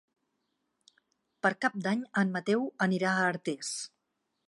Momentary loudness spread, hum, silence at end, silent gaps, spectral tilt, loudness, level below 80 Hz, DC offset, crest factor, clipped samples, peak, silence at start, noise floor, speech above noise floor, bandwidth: 8 LU; none; 0.6 s; none; -5 dB/octave; -30 LUFS; -82 dBFS; under 0.1%; 20 dB; under 0.1%; -12 dBFS; 1.45 s; -81 dBFS; 51 dB; 11.5 kHz